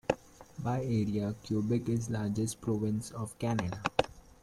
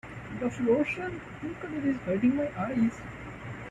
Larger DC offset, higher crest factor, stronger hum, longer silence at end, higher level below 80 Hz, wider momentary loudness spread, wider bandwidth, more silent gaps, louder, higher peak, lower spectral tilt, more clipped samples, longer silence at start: neither; first, 24 dB vs 16 dB; neither; first, 0.2 s vs 0 s; about the same, -58 dBFS vs -54 dBFS; second, 6 LU vs 14 LU; first, 14 kHz vs 9.4 kHz; neither; second, -34 LUFS vs -30 LUFS; first, -10 dBFS vs -14 dBFS; about the same, -6.5 dB/octave vs -7.5 dB/octave; neither; about the same, 0.1 s vs 0.05 s